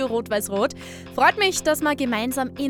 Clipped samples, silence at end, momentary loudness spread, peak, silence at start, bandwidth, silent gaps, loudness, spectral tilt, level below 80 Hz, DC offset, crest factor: under 0.1%; 0 s; 8 LU; -4 dBFS; 0 s; over 20 kHz; none; -22 LUFS; -3 dB/octave; -54 dBFS; under 0.1%; 18 dB